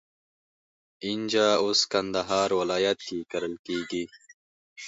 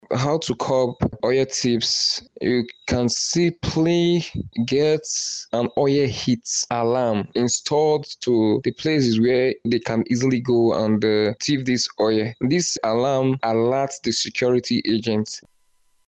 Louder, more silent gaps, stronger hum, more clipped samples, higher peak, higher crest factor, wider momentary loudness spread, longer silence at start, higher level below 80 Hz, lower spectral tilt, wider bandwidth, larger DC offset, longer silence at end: second, -26 LUFS vs -21 LUFS; first, 3.59-3.64 s, 4.34-4.76 s vs none; neither; neither; about the same, -10 dBFS vs -10 dBFS; first, 20 dB vs 12 dB; first, 11 LU vs 5 LU; first, 1 s vs 0.1 s; second, -64 dBFS vs -50 dBFS; second, -3 dB/octave vs -4.5 dB/octave; second, 8 kHz vs 9 kHz; neither; second, 0 s vs 0.7 s